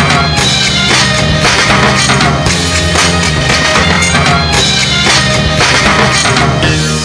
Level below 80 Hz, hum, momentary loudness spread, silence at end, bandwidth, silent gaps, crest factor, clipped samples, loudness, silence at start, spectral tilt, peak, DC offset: -24 dBFS; none; 3 LU; 0 s; 11 kHz; none; 8 dB; 0.5%; -8 LUFS; 0 s; -3 dB/octave; 0 dBFS; under 0.1%